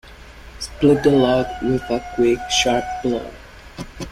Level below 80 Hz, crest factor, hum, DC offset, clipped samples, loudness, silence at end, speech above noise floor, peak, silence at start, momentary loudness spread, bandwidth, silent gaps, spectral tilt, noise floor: -40 dBFS; 18 dB; none; under 0.1%; under 0.1%; -18 LUFS; 0 s; 22 dB; -2 dBFS; 0.05 s; 20 LU; 15 kHz; none; -4.5 dB/octave; -40 dBFS